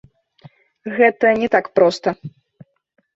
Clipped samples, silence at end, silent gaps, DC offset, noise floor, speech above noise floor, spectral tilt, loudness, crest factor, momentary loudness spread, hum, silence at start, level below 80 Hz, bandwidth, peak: under 0.1%; 0.85 s; none; under 0.1%; -49 dBFS; 33 dB; -5.5 dB/octave; -17 LUFS; 18 dB; 19 LU; none; 0.85 s; -60 dBFS; 7.8 kHz; -2 dBFS